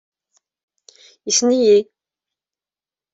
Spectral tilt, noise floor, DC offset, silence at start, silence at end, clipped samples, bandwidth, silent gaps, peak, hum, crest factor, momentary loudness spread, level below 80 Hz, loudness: -2.5 dB/octave; under -90 dBFS; under 0.1%; 1.25 s; 1.3 s; under 0.1%; 8.2 kHz; none; -4 dBFS; none; 18 dB; 21 LU; -68 dBFS; -15 LUFS